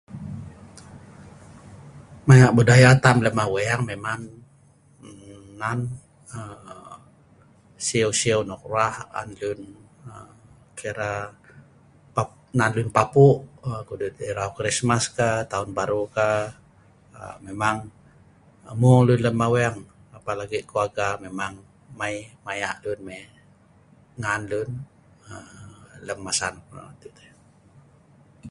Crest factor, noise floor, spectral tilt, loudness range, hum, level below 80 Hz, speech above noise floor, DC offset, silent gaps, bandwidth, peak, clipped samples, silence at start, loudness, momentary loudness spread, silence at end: 24 dB; -56 dBFS; -5.5 dB/octave; 15 LU; none; -52 dBFS; 34 dB; under 0.1%; none; 11.5 kHz; 0 dBFS; under 0.1%; 0.1 s; -22 LUFS; 25 LU; 0 s